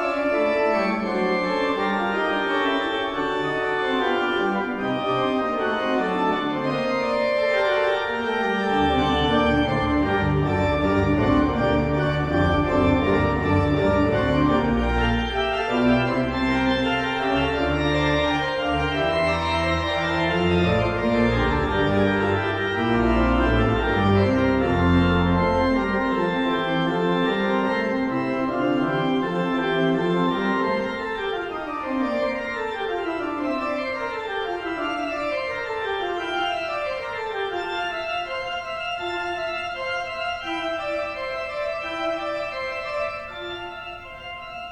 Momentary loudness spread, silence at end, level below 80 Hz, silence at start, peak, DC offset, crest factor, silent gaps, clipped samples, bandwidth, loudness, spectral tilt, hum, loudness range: 7 LU; 0 s; -36 dBFS; 0 s; -8 dBFS; under 0.1%; 16 dB; none; under 0.1%; 10 kHz; -23 LUFS; -7 dB/octave; none; 6 LU